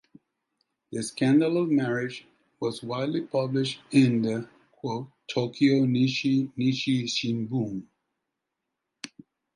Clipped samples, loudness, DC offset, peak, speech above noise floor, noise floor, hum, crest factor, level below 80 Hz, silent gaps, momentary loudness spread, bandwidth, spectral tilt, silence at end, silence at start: under 0.1%; -26 LUFS; under 0.1%; -8 dBFS; 58 dB; -84 dBFS; none; 18 dB; -70 dBFS; none; 16 LU; 11.5 kHz; -6 dB/octave; 0.5 s; 0.9 s